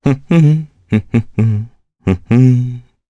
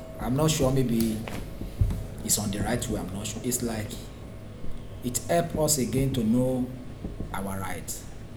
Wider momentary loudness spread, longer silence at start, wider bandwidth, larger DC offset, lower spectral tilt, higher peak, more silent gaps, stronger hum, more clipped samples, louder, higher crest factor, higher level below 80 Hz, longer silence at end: second, 12 LU vs 15 LU; about the same, 0.05 s vs 0 s; second, 7.8 kHz vs over 20 kHz; neither; first, -9.5 dB/octave vs -5 dB/octave; first, 0 dBFS vs -8 dBFS; neither; neither; neither; first, -14 LUFS vs -28 LUFS; second, 14 dB vs 20 dB; about the same, -42 dBFS vs -40 dBFS; first, 0.3 s vs 0 s